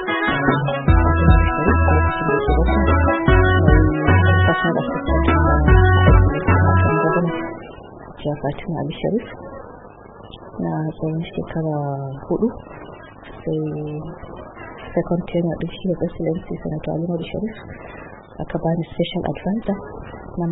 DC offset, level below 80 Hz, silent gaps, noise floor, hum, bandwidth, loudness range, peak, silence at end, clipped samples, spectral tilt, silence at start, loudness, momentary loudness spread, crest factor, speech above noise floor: under 0.1%; -26 dBFS; none; -40 dBFS; none; 4 kHz; 11 LU; 0 dBFS; 0 s; under 0.1%; -12.5 dB/octave; 0 s; -19 LUFS; 21 LU; 18 dB; 17 dB